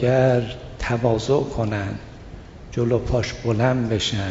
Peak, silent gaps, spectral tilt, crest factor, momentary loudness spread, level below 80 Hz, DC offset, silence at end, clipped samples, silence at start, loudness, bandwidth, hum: -4 dBFS; none; -6 dB/octave; 18 dB; 16 LU; -38 dBFS; under 0.1%; 0 s; under 0.1%; 0 s; -22 LUFS; 7.8 kHz; none